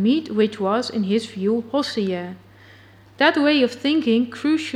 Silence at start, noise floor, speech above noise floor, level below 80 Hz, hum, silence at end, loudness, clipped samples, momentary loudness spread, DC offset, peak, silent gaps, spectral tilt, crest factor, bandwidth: 0 s; -48 dBFS; 28 dB; -64 dBFS; none; 0 s; -21 LUFS; under 0.1%; 6 LU; under 0.1%; -2 dBFS; none; -5.5 dB/octave; 18 dB; 11.5 kHz